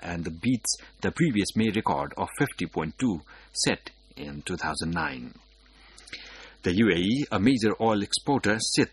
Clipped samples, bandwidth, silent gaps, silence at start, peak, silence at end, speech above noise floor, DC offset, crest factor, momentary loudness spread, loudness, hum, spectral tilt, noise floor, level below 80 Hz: under 0.1%; 12 kHz; none; 0 s; -8 dBFS; 0.05 s; 28 dB; under 0.1%; 20 dB; 17 LU; -27 LUFS; none; -4.5 dB/octave; -55 dBFS; -52 dBFS